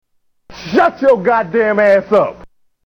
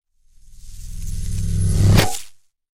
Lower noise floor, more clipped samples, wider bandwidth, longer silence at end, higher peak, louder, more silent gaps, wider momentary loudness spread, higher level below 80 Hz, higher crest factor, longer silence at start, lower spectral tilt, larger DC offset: second, -43 dBFS vs -48 dBFS; neither; second, 7.4 kHz vs 16 kHz; about the same, 0.55 s vs 0.45 s; about the same, -2 dBFS vs 0 dBFS; first, -13 LUFS vs -20 LUFS; neither; second, 7 LU vs 21 LU; second, -50 dBFS vs -26 dBFS; second, 12 dB vs 20 dB; about the same, 0.5 s vs 0.55 s; first, -6.5 dB/octave vs -5 dB/octave; neither